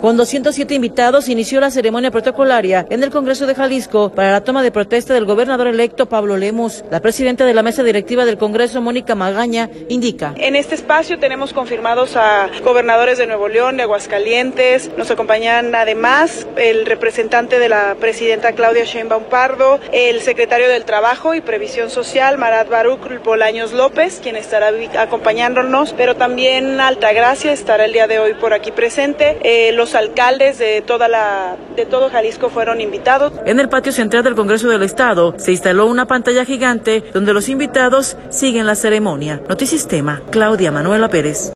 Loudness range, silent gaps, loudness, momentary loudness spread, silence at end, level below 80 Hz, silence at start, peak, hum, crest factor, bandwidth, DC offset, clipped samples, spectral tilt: 2 LU; none; -14 LUFS; 6 LU; 0 s; -48 dBFS; 0 s; 0 dBFS; none; 14 dB; 12.5 kHz; under 0.1%; under 0.1%; -3.5 dB/octave